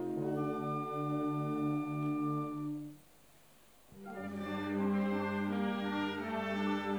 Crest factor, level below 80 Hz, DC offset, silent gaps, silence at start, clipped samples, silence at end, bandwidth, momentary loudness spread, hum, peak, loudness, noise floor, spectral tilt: 14 dB; -76 dBFS; under 0.1%; none; 0 s; under 0.1%; 0 s; over 20 kHz; 8 LU; none; -24 dBFS; -36 LUFS; -64 dBFS; -7.5 dB/octave